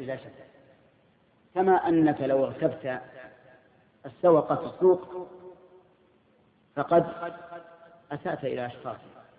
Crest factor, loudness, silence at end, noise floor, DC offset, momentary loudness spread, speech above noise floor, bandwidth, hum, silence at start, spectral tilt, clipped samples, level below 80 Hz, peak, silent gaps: 18 dB; -26 LUFS; 0.15 s; -64 dBFS; under 0.1%; 23 LU; 37 dB; 4.7 kHz; none; 0 s; -11 dB/octave; under 0.1%; -68 dBFS; -10 dBFS; none